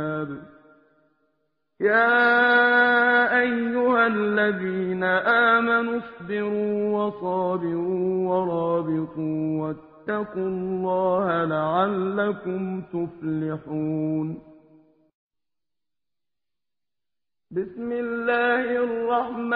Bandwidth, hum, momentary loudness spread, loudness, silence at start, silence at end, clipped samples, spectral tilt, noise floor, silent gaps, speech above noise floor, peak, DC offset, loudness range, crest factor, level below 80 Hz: 5.2 kHz; none; 12 LU; -23 LUFS; 0 s; 0 s; under 0.1%; -4 dB/octave; under -90 dBFS; 15.14-15.29 s; over 66 dB; -6 dBFS; under 0.1%; 13 LU; 18 dB; -64 dBFS